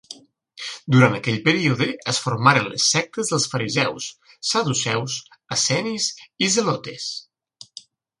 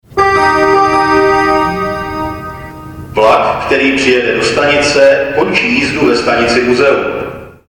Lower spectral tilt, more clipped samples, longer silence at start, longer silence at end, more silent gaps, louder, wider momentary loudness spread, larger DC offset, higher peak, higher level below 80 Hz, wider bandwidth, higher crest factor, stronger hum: about the same, -3.5 dB/octave vs -4.5 dB/octave; neither; about the same, 0.1 s vs 0.1 s; first, 1 s vs 0.2 s; neither; second, -20 LUFS vs -10 LUFS; first, 16 LU vs 12 LU; neither; about the same, 0 dBFS vs 0 dBFS; second, -62 dBFS vs -36 dBFS; second, 11.5 kHz vs 18 kHz; first, 22 dB vs 10 dB; neither